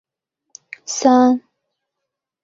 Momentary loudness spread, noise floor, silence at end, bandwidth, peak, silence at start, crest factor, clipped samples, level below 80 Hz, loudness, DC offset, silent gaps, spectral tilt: 21 LU; -81 dBFS; 1.05 s; 7.8 kHz; -2 dBFS; 0.9 s; 18 dB; under 0.1%; -66 dBFS; -16 LUFS; under 0.1%; none; -3 dB/octave